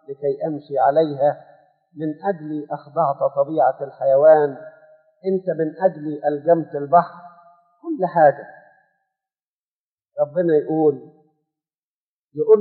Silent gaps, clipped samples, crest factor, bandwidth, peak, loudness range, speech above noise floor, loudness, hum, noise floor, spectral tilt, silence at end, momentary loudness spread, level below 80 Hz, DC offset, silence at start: 9.43-9.98 s, 11.83-12.29 s; under 0.1%; 18 dB; 4.5 kHz; -2 dBFS; 5 LU; over 71 dB; -20 LUFS; none; under -90 dBFS; -7 dB/octave; 0 s; 14 LU; -84 dBFS; under 0.1%; 0.1 s